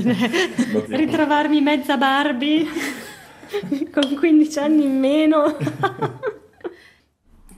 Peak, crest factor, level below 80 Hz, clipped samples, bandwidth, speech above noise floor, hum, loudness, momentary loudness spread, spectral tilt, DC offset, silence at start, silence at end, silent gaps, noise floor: -4 dBFS; 16 dB; -60 dBFS; under 0.1%; 15 kHz; 36 dB; none; -19 LUFS; 14 LU; -5 dB/octave; under 0.1%; 0 s; 0.85 s; none; -54 dBFS